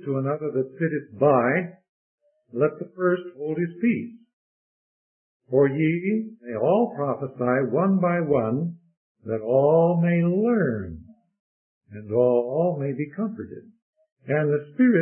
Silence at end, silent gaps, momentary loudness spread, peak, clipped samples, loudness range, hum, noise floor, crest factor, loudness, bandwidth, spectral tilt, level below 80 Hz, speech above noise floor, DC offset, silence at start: 0 s; 1.89-2.18 s, 4.33-5.40 s, 8.97-9.15 s, 11.39-11.81 s, 13.82-13.93 s, 14.12-14.16 s; 13 LU; -6 dBFS; under 0.1%; 5 LU; none; under -90 dBFS; 18 dB; -23 LUFS; 3.3 kHz; -13 dB/octave; -62 dBFS; over 67 dB; under 0.1%; 0 s